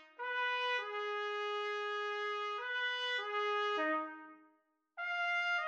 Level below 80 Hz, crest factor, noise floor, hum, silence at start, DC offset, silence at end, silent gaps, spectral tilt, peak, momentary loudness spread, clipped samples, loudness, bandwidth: under -90 dBFS; 14 dB; -75 dBFS; none; 0 s; under 0.1%; 0 s; none; 0.5 dB/octave; -24 dBFS; 6 LU; under 0.1%; -37 LUFS; 8.4 kHz